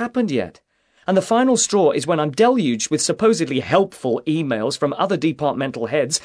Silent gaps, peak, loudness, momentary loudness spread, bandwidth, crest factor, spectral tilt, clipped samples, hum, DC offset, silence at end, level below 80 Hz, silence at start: none; -2 dBFS; -19 LUFS; 6 LU; 11 kHz; 18 dB; -4.5 dB/octave; under 0.1%; none; under 0.1%; 0.05 s; -60 dBFS; 0 s